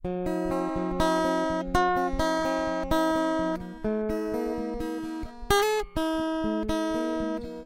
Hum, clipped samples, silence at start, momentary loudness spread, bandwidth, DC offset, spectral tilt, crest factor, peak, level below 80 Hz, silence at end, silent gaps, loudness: none; under 0.1%; 0 s; 8 LU; 16.5 kHz; under 0.1%; -5 dB/octave; 18 dB; -10 dBFS; -42 dBFS; 0 s; none; -28 LUFS